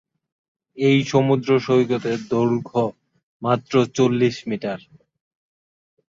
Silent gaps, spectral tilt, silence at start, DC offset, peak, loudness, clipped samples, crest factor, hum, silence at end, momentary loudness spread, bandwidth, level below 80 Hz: 3.23-3.40 s; -6.5 dB/octave; 0.75 s; under 0.1%; -2 dBFS; -20 LUFS; under 0.1%; 18 dB; none; 1.3 s; 10 LU; 7.6 kHz; -60 dBFS